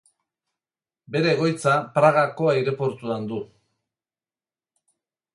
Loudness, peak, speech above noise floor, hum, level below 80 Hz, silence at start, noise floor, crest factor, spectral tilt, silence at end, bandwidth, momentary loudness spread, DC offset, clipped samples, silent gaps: -22 LUFS; -4 dBFS; over 69 dB; none; -68 dBFS; 1.1 s; under -90 dBFS; 22 dB; -6 dB/octave; 1.9 s; 11.5 kHz; 12 LU; under 0.1%; under 0.1%; none